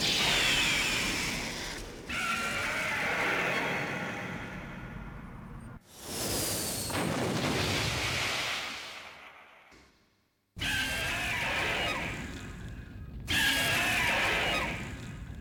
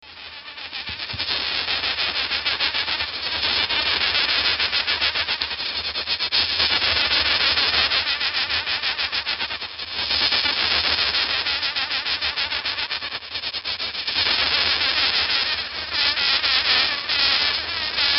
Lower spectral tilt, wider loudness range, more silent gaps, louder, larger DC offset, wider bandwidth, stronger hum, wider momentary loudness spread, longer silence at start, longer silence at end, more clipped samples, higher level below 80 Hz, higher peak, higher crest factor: about the same, -2.5 dB/octave vs -2.5 dB/octave; about the same, 5 LU vs 3 LU; neither; second, -29 LUFS vs -20 LUFS; neither; first, 19 kHz vs 6.2 kHz; neither; first, 19 LU vs 8 LU; about the same, 0 s vs 0.05 s; about the same, 0 s vs 0 s; neither; about the same, -50 dBFS vs -48 dBFS; second, -14 dBFS vs -4 dBFS; about the same, 18 dB vs 20 dB